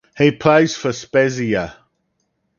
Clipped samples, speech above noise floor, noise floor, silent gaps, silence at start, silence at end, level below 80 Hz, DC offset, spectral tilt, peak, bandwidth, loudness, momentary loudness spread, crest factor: under 0.1%; 53 dB; -69 dBFS; none; 0.15 s; 0.85 s; -52 dBFS; under 0.1%; -5.5 dB/octave; 0 dBFS; 7.2 kHz; -17 LUFS; 9 LU; 18 dB